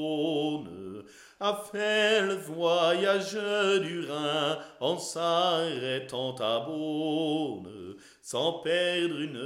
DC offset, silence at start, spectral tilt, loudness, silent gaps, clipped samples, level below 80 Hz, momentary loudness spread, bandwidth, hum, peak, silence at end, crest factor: under 0.1%; 0 s; -4 dB/octave; -29 LUFS; none; under 0.1%; -76 dBFS; 13 LU; 16 kHz; none; -12 dBFS; 0 s; 16 dB